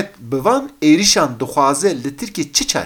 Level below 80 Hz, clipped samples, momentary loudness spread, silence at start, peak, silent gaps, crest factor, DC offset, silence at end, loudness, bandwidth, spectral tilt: -46 dBFS; under 0.1%; 12 LU; 0 s; 0 dBFS; none; 16 dB; under 0.1%; 0 s; -16 LUFS; 18 kHz; -3 dB/octave